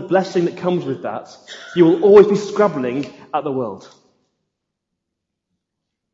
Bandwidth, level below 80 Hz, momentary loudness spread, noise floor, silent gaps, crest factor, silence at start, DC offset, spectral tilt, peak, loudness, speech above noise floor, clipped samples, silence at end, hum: 7.8 kHz; -62 dBFS; 20 LU; -79 dBFS; none; 18 dB; 0 s; under 0.1%; -7 dB/octave; 0 dBFS; -16 LUFS; 62 dB; under 0.1%; 2.35 s; none